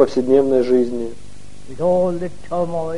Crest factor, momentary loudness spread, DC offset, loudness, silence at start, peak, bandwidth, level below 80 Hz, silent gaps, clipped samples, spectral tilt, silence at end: 16 dB; 12 LU; 4%; -18 LUFS; 0 s; -2 dBFS; 11 kHz; -46 dBFS; none; under 0.1%; -7.5 dB/octave; 0 s